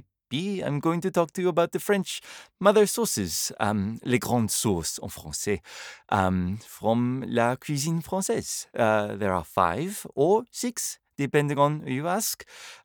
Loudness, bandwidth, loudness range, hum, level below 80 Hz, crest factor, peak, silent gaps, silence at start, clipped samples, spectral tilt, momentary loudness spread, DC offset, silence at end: -26 LUFS; over 20 kHz; 2 LU; none; -60 dBFS; 20 dB; -6 dBFS; none; 0.3 s; under 0.1%; -4.5 dB/octave; 9 LU; under 0.1%; 0.1 s